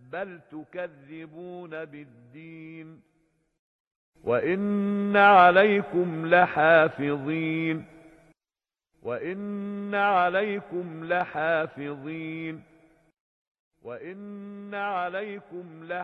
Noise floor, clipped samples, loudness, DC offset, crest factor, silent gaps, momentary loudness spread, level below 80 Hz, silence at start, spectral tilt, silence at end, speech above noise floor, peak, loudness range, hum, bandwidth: under -90 dBFS; under 0.1%; -24 LUFS; under 0.1%; 22 dB; 3.59-4.13 s, 13.20-13.71 s; 23 LU; -70 dBFS; 0.1 s; -8 dB/octave; 0 s; over 64 dB; -4 dBFS; 19 LU; none; 5.8 kHz